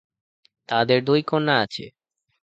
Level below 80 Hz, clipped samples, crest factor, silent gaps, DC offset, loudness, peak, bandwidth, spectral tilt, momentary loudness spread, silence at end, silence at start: -64 dBFS; under 0.1%; 20 dB; none; under 0.1%; -21 LUFS; -4 dBFS; 8.2 kHz; -6.5 dB/octave; 9 LU; 0.55 s; 0.7 s